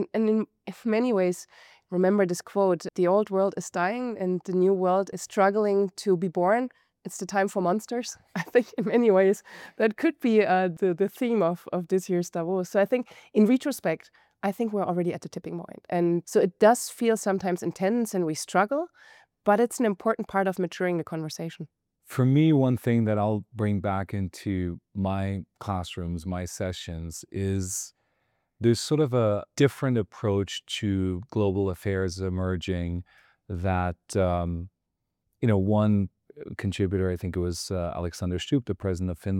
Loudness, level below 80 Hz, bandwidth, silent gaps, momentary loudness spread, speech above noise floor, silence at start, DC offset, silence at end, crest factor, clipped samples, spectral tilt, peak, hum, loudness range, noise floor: -26 LUFS; -58 dBFS; 17 kHz; none; 11 LU; 56 dB; 0 s; under 0.1%; 0 s; 18 dB; under 0.1%; -6 dB/octave; -8 dBFS; none; 5 LU; -82 dBFS